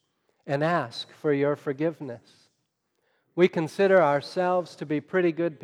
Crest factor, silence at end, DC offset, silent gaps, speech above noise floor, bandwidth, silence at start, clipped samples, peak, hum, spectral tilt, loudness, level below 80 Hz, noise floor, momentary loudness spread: 18 dB; 0.1 s; under 0.1%; none; 51 dB; 11.5 kHz; 0.45 s; under 0.1%; -8 dBFS; none; -7 dB/octave; -25 LUFS; -82 dBFS; -76 dBFS; 13 LU